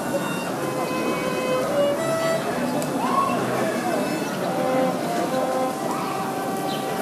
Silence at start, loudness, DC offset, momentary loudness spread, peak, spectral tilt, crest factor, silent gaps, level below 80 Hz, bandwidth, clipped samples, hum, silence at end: 0 s; -24 LUFS; under 0.1%; 4 LU; -10 dBFS; -4.5 dB/octave; 14 dB; none; -60 dBFS; 15.5 kHz; under 0.1%; none; 0 s